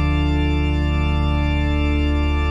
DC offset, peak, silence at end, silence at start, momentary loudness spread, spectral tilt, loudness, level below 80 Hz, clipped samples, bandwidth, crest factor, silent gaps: under 0.1%; -8 dBFS; 0 s; 0 s; 1 LU; -7.5 dB/octave; -20 LUFS; -20 dBFS; under 0.1%; 7.4 kHz; 10 dB; none